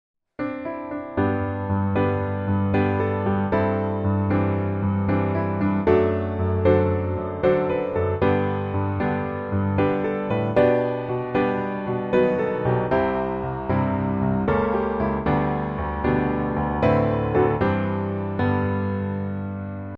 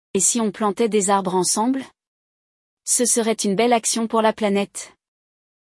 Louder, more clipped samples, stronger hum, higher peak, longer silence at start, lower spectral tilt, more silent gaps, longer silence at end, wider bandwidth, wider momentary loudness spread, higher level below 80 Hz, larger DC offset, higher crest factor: second, -23 LUFS vs -19 LUFS; neither; neither; about the same, -6 dBFS vs -4 dBFS; first, 0.4 s vs 0.15 s; first, -10.5 dB/octave vs -3 dB/octave; second, none vs 2.07-2.77 s; second, 0 s vs 0.9 s; second, 5 kHz vs 12 kHz; second, 7 LU vs 10 LU; first, -42 dBFS vs -68 dBFS; neither; about the same, 16 dB vs 16 dB